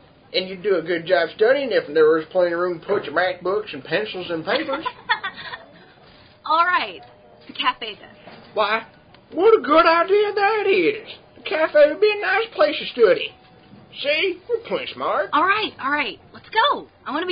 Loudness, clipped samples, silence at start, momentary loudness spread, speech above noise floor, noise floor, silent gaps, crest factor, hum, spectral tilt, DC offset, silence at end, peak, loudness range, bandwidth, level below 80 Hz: -20 LUFS; under 0.1%; 0.35 s; 14 LU; 29 dB; -49 dBFS; none; 16 dB; none; -8.5 dB/octave; under 0.1%; 0 s; -4 dBFS; 6 LU; 5.2 kHz; -60 dBFS